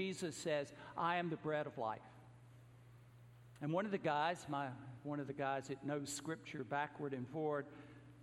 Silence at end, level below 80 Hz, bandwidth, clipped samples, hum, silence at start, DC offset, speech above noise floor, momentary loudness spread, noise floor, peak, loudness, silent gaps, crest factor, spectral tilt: 0 s; -78 dBFS; 16 kHz; under 0.1%; none; 0 s; under 0.1%; 20 dB; 23 LU; -62 dBFS; -24 dBFS; -42 LUFS; none; 20 dB; -5 dB/octave